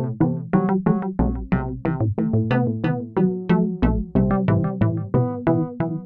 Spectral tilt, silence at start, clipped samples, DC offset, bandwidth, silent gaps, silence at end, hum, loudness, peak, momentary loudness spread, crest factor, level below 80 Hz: -11.5 dB/octave; 0 s; under 0.1%; under 0.1%; 4.4 kHz; none; 0 s; none; -22 LUFS; -4 dBFS; 4 LU; 16 dB; -34 dBFS